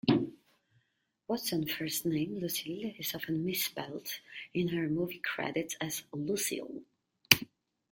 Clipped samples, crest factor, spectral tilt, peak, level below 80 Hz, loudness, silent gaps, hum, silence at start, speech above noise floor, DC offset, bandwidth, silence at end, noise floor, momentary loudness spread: under 0.1%; 34 dB; -3.5 dB/octave; 0 dBFS; -70 dBFS; -33 LUFS; none; none; 0.05 s; 44 dB; under 0.1%; 17 kHz; 0.45 s; -79 dBFS; 14 LU